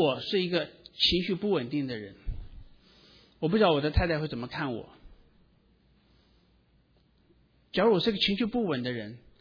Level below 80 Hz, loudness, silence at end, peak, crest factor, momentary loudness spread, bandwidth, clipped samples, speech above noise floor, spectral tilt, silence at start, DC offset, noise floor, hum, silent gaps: -46 dBFS; -28 LUFS; 0.2 s; -10 dBFS; 20 dB; 16 LU; 5.4 kHz; under 0.1%; 38 dB; -6.5 dB/octave; 0 s; under 0.1%; -65 dBFS; none; none